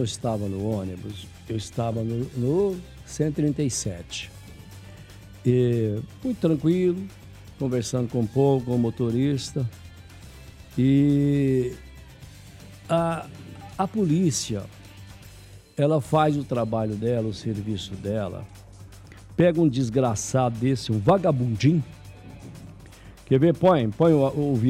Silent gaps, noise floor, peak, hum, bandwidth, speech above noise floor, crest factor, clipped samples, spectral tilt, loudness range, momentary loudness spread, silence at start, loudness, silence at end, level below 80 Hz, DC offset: none; -46 dBFS; -8 dBFS; none; 15 kHz; 23 dB; 18 dB; under 0.1%; -6.5 dB/octave; 5 LU; 24 LU; 0 s; -24 LUFS; 0 s; -50 dBFS; under 0.1%